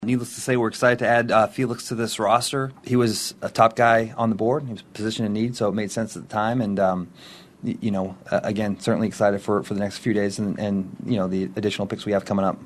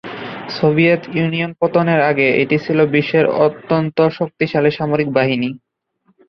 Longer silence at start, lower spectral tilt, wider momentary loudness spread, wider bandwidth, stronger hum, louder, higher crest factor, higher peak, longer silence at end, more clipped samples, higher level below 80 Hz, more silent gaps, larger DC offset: about the same, 0 s vs 0.05 s; second, -5.5 dB/octave vs -8.5 dB/octave; first, 9 LU vs 6 LU; first, 13 kHz vs 6.2 kHz; neither; second, -23 LUFS vs -16 LUFS; first, 20 dB vs 14 dB; about the same, -2 dBFS vs -2 dBFS; second, 0 s vs 0.7 s; neither; about the same, -58 dBFS vs -56 dBFS; neither; neither